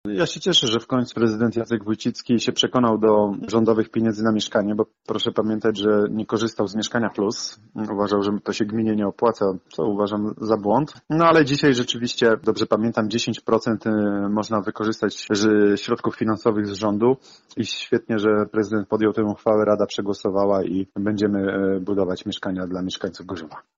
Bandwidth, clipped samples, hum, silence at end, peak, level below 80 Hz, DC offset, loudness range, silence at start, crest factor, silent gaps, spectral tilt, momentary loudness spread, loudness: 7.8 kHz; under 0.1%; none; 0.2 s; -6 dBFS; -58 dBFS; under 0.1%; 3 LU; 0.05 s; 16 dB; none; -5 dB/octave; 8 LU; -22 LUFS